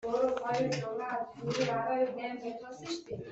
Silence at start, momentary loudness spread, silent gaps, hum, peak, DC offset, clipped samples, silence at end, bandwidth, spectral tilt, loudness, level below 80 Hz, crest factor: 0 s; 9 LU; none; none; -18 dBFS; under 0.1%; under 0.1%; 0 s; 8.2 kHz; -5 dB/octave; -34 LUFS; -68 dBFS; 16 dB